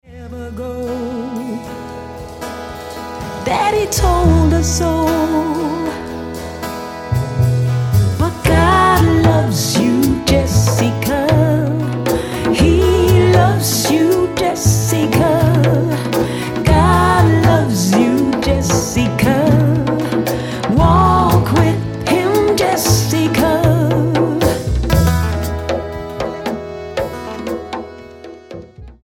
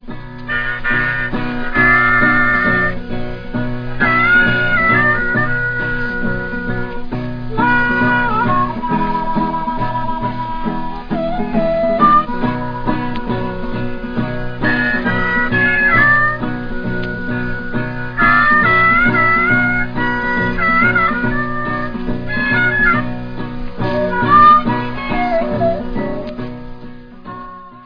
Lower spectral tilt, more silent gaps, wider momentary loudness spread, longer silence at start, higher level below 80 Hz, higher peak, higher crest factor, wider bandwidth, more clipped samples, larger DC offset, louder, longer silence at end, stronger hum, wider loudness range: second, -5.5 dB/octave vs -8 dB/octave; neither; about the same, 15 LU vs 14 LU; about the same, 0.1 s vs 0 s; about the same, -26 dBFS vs -28 dBFS; about the same, 0 dBFS vs 0 dBFS; about the same, 14 dB vs 16 dB; first, 17.5 kHz vs 5.2 kHz; neither; neither; about the same, -14 LUFS vs -15 LUFS; about the same, 0.1 s vs 0 s; neither; about the same, 6 LU vs 4 LU